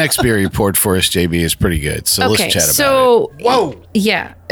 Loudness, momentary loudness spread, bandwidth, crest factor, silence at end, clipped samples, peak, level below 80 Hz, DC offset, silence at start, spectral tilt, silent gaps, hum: -13 LUFS; 6 LU; over 20 kHz; 12 dB; 0.15 s; under 0.1%; -2 dBFS; -32 dBFS; under 0.1%; 0 s; -3.5 dB/octave; none; none